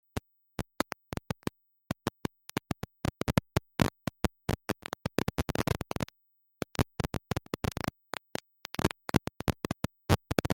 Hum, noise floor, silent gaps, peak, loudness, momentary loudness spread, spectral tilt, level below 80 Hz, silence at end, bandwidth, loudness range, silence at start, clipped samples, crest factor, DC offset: none; -73 dBFS; none; -8 dBFS; -35 LUFS; 11 LU; -5.5 dB/octave; -48 dBFS; 0 s; 17 kHz; 3 LU; 0.15 s; under 0.1%; 26 dB; under 0.1%